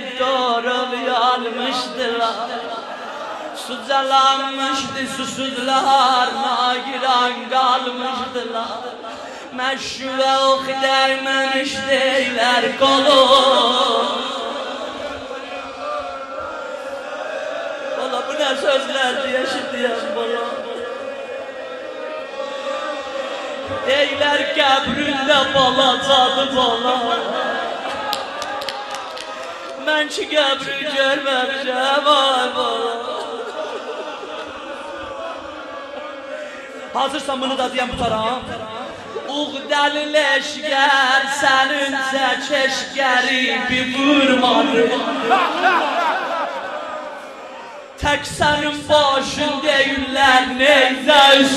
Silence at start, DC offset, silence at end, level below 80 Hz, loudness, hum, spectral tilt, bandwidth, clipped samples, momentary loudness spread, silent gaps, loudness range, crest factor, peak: 0 s; under 0.1%; 0 s; -52 dBFS; -18 LUFS; none; -2.5 dB/octave; 13.5 kHz; under 0.1%; 15 LU; none; 10 LU; 18 dB; 0 dBFS